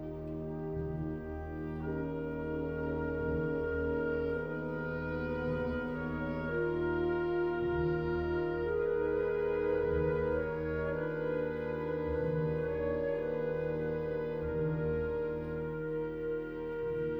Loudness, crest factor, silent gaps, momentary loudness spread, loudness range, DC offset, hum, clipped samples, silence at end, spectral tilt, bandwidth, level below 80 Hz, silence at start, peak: -35 LUFS; 12 dB; none; 6 LU; 3 LU; under 0.1%; none; under 0.1%; 0 s; -10 dB/octave; 5.4 kHz; -48 dBFS; 0 s; -22 dBFS